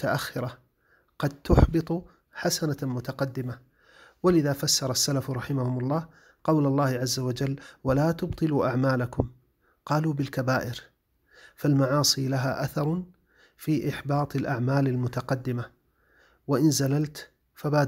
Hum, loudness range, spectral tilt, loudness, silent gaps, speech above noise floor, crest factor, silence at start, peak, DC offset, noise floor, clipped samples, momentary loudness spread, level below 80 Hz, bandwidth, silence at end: none; 2 LU; -5 dB/octave; -27 LUFS; none; 40 dB; 22 dB; 0 s; -4 dBFS; under 0.1%; -66 dBFS; under 0.1%; 12 LU; -40 dBFS; 16 kHz; 0 s